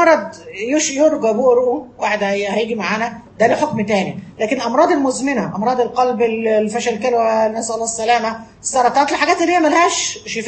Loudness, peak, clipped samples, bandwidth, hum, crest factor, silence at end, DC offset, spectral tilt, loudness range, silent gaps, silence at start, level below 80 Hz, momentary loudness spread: -16 LUFS; 0 dBFS; under 0.1%; 8.8 kHz; none; 16 dB; 0 s; under 0.1%; -3.5 dB/octave; 2 LU; none; 0 s; -56 dBFS; 7 LU